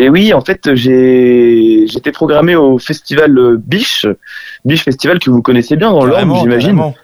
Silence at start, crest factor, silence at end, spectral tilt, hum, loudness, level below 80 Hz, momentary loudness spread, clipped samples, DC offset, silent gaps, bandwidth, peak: 0 s; 8 dB; 0.1 s; -6.5 dB/octave; none; -9 LUFS; -44 dBFS; 7 LU; under 0.1%; under 0.1%; none; over 20 kHz; 0 dBFS